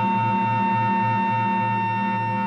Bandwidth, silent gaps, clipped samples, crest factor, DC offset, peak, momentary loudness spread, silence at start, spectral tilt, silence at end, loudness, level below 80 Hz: 6.8 kHz; none; under 0.1%; 10 dB; under 0.1%; -12 dBFS; 2 LU; 0 s; -8 dB/octave; 0 s; -22 LUFS; -64 dBFS